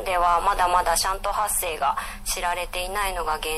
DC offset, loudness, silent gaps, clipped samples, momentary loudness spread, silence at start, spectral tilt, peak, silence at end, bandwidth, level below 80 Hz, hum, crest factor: under 0.1%; -23 LUFS; none; under 0.1%; 7 LU; 0 s; -1 dB/octave; -8 dBFS; 0 s; 15.5 kHz; -36 dBFS; none; 16 dB